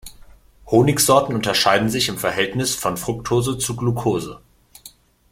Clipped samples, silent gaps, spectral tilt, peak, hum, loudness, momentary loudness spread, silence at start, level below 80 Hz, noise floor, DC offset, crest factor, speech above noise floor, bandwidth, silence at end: under 0.1%; none; -4 dB/octave; -2 dBFS; none; -19 LUFS; 8 LU; 0.05 s; -46 dBFS; -47 dBFS; under 0.1%; 20 dB; 28 dB; 16.5 kHz; 0.45 s